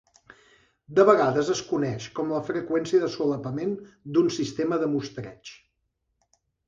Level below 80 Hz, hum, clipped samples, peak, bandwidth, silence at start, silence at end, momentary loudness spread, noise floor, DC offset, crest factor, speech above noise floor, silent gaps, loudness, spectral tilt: -64 dBFS; none; under 0.1%; -4 dBFS; 7.8 kHz; 0.9 s; 1.15 s; 17 LU; -77 dBFS; under 0.1%; 22 dB; 52 dB; none; -25 LUFS; -6 dB/octave